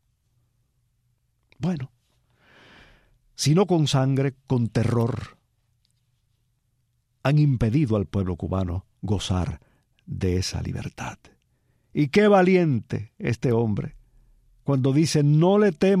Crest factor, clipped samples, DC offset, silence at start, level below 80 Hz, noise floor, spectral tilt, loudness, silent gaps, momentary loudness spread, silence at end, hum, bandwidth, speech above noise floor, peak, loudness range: 18 dB; under 0.1%; under 0.1%; 1.6 s; -48 dBFS; -70 dBFS; -6.5 dB/octave; -23 LUFS; none; 15 LU; 0 s; none; 14 kHz; 49 dB; -6 dBFS; 6 LU